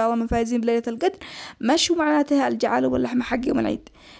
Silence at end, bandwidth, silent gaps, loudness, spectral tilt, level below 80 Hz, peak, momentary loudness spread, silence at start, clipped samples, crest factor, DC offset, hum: 0.05 s; 8 kHz; none; -22 LUFS; -4 dB/octave; -44 dBFS; -8 dBFS; 8 LU; 0 s; under 0.1%; 14 dB; under 0.1%; none